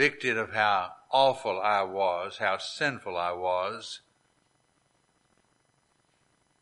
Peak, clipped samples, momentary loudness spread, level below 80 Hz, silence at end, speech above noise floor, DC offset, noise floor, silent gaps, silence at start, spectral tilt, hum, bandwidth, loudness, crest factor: -8 dBFS; under 0.1%; 8 LU; -74 dBFS; 2.65 s; 42 dB; under 0.1%; -70 dBFS; none; 0 s; -3.5 dB/octave; none; 11.5 kHz; -28 LUFS; 22 dB